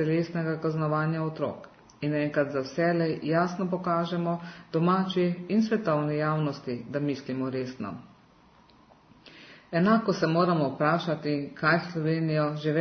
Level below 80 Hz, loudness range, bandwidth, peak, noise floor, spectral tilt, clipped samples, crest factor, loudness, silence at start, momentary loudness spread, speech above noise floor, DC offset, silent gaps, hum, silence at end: -68 dBFS; 5 LU; 6.4 kHz; -10 dBFS; -58 dBFS; -7.5 dB/octave; under 0.1%; 18 dB; -28 LUFS; 0 s; 9 LU; 31 dB; under 0.1%; none; none; 0 s